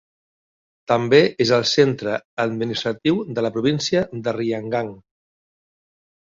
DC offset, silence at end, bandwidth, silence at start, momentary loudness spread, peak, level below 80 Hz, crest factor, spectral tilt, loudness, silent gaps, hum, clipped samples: under 0.1%; 1.35 s; 7.6 kHz; 0.9 s; 10 LU; -2 dBFS; -58 dBFS; 20 dB; -5 dB/octave; -20 LUFS; 2.25-2.37 s; none; under 0.1%